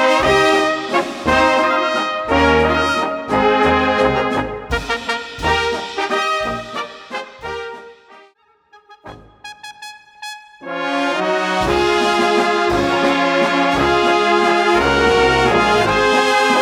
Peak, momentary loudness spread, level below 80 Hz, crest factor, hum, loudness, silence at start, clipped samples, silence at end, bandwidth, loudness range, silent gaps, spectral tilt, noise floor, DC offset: 0 dBFS; 16 LU; -36 dBFS; 16 dB; none; -15 LUFS; 0 s; under 0.1%; 0 s; 16 kHz; 16 LU; none; -4 dB/octave; -53 dBFS; under 0.1%